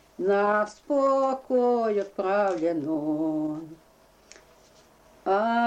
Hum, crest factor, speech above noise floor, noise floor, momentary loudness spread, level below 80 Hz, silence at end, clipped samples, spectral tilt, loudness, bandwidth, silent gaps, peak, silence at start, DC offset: none; 14 dB; 33 dB; -58 dBFS; 7 LU; -68 dBFS; 0 s; under 0.1%; -6.5 dB/octave; -26 LUFS; 9.6 kHz; none; -14 dBFS; 0.2 s; under 0.1%